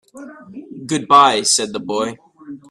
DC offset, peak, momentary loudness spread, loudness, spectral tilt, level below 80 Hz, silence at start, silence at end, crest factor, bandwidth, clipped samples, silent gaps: under 0.1%; 0 dBFS; 25 LU; -15 LUFS; -2 dB/octave; -62 dBFS; 0.15 s; 0.15 s; 18 dB; 13 kHz; under 0.1%; none